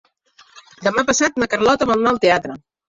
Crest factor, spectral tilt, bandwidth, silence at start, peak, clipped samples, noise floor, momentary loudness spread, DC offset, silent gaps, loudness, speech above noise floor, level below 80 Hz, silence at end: 18 dB; -3 dB/octave; 7.8 kHz; 0.55 s; -2 dBFS; under 0.1%; -53 dBFS; 8 LU; under 0.1%; none; -17 LUFS; 36 dB; -50 dBFS; 0.4 s